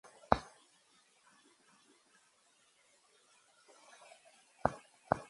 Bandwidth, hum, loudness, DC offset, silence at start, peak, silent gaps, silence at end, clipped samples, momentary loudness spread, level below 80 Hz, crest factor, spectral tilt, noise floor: 11.5 kHz; none; -37 LUFS; under 0.1%; 0.3 s; -6 dBFS; none; 0.05 s; under 0.1%; 27 LU; -62 dBFS; 38 dB; -5.5 dB/octave; -71 dBFS